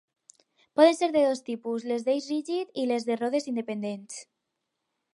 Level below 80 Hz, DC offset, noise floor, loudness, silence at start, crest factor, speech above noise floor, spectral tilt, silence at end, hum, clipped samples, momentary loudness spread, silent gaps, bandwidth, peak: -80 dBFS; under 0.1%; -82 dBFS; -27 LUFS; 0.75 s; 22 dB; 56 dB; -4.5 dB/octave; 0.9 s; none; under 0.1%; 13 LU; none; 11.5 kHz; -6 dBFS